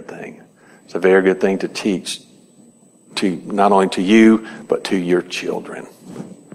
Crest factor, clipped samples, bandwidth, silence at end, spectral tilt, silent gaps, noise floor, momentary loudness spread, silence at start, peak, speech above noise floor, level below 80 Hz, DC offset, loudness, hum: 18 dB; under 0.1%; 13 kHz; 0.2 s; -5.5 dB/octave; none; -49 dBFS; 22 LU; 0 s; 0 dBFS; 33 dB; -62 dBFS; under 0.1%; -17 LUFS; none